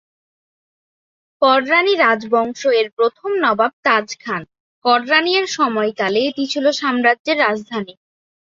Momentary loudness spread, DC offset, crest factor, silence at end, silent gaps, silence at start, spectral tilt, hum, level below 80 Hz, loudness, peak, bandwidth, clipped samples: 11 LU; under 0.1%; 16 dB; 0.65 s; 2.93-2.97 s, 3.73-3.83 s, 4.60-4.82 s, 7.19-7.25 s; 1.4 s; -3.5 dB/octave; none; -66 dBFS; -17 LUFS; -2 dBFS; 7.6 kHz; under 0.1%